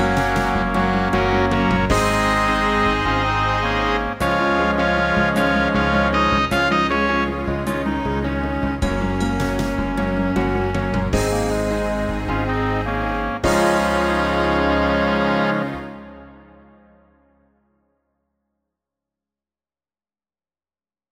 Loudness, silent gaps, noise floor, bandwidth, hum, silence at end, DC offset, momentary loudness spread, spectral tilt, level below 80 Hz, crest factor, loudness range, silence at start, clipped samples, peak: -19 LUFS; none; under -90 dBFS; 16 kHz; none; 4.75 s; under 0.1%; 5 LU; -5.5 dB/octave; -32 dBFS; 16 dB; 4 LU; 0 s; under 0.1%; -4 dBFS